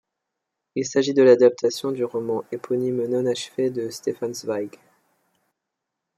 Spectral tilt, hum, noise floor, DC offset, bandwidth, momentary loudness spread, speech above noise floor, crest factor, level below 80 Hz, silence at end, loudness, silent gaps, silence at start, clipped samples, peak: -5 dB/octave; none; -82 dBFS; under 0.1%; 14 kHz; 13 LU; 61 dB; 20 dB; -74 dBFS; 1.5 s; -22 LUFS; none; 0.75 s; under 0.1%; -4 dBFS